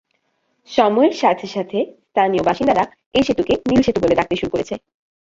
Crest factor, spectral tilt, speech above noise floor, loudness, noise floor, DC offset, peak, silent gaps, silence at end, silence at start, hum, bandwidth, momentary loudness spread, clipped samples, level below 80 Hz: 16 dB; -6 dB/octave; 50 dB; -18 LUFS; -67 dBFS; under 0.1%; -2 dBFS; 3.06-3.11 s; 0.45 s; 0.7 s; none; 7.8 kHz; 8 LU; under 0.1%; -46 dBFS